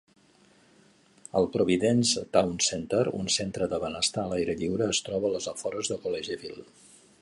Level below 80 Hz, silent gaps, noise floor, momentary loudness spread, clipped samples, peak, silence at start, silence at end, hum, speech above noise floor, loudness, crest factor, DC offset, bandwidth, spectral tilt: -58 dBFS; none; -60 dBFS; 9 LU; under 0.1%; -8 dBFS; 1.35 s; 0.6 s; none; 33 dB; -28 LUFS; 22 dB; under 0.1%; 11.5 kHz; -3.5 dB/octave